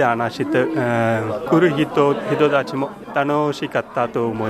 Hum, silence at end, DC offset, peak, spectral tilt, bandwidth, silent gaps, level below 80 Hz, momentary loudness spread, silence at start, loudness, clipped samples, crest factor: none; 0 s; under 0.1%; -4 dBFS; -7 dB/octave; 14.5 kHz; none; -56 dBFS; 6 LU; 0 s; -19 LUFS; under 0.1%; 16 dB